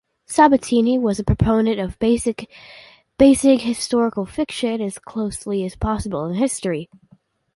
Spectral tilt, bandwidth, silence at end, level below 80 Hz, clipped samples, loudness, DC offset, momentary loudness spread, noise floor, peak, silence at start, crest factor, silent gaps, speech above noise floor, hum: -5.5 dB/octave; 11.5 kHz; 0.7 s; -38 dBFS; under 0.1%; -19 LUFS; under 0.1%; 11 LU; -56 dBFS; -2 dBFS; 0.3 s; 18 dB; none; 37 dB; none